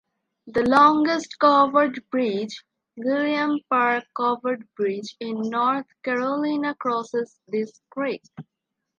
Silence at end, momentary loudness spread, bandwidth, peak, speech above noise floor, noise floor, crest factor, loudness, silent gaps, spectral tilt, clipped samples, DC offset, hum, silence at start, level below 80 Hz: 0.55 s; 13 LU; 10.5 kHz; -4 dBFS; 60 dB; -82 dBFS; 20 dB; -23 LUFS; none; -5 dB/octave; under 0.1%; under 0.1%; none; 0.45 s; -64 dBFS